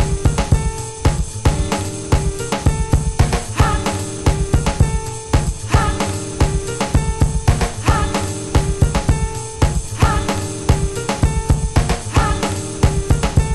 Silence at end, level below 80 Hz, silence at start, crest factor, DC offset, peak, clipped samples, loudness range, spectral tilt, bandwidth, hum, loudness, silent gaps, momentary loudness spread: 0 s; -22 dBFS; 0 s; 16 dB; under 0.1%; 0 dBFS; under 0.1%; 1 LU; -5.5 dB/octave; 12.5 kHz; none; -18 LUFS; none; 4 LU